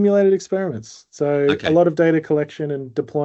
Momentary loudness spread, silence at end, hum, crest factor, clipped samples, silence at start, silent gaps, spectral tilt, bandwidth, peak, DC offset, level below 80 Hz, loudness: 10 LU; 0 s; none; 16 dB; under 0.1%; 0 s; none; -7 dB/octave; 8.2 kHz; -2 dBFS; under 0.1%; -62 dBFS; -19 LUFS